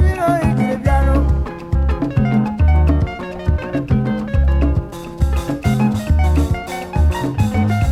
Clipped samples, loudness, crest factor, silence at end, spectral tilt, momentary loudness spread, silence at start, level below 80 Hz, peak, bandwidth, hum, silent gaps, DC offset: under 0.1%; -17 LUFS; 12 dB; 0 s; -8 dB/octave; 6 LU; 0 s; -20 dBFS; -2 dBFS; 13 kHz; none; none; under 0.1%